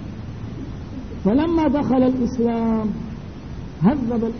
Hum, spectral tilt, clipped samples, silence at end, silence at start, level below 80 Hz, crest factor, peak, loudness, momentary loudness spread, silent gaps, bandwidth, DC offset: none; -9 dB/octave; under 0.1%; 0 s; 0 s; -38 dBFS; 18 dB; -4 dBFS; -20 LUFS; 15 LU; none; 6.4 kHz; 0.6%